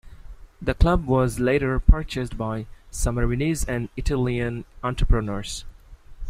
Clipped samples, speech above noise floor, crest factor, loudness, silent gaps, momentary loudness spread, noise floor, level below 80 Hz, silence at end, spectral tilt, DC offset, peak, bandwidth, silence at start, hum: under 0.1%; 22 dB; 20 dB; -25 LUFS; none; 10 LU; -44 dBFS; -26 dBFS; 0 s; -6 dB/octave; under 0.1%; -2 dBFS; 15 kHz; 0.05 s; none